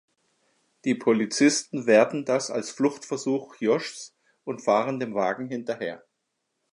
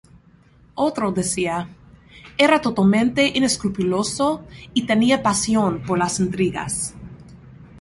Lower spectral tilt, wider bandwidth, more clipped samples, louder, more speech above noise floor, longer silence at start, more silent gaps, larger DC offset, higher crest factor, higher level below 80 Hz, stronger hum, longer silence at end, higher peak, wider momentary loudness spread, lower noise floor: about the same, -4 dB/octave vs -4.5 dB/octave; about the same, 11.5 kHz vs 11.5 kHz; neither; second, -25 LUFS vs -20 LUFS; first, 54 dB vs 32 dB; about the same, 0.85 s vs 0.75 s; neither; neither; about the same, 20 dB vs 20 dB; second, -78 dBFS vs -48 dBFS; neither; first, 0.75 s vs 0 s; second, -6 dBFS vs -2 dBFS; first, 15 LU vs 12 LU; first, -79 dBFS vs -52 dBFS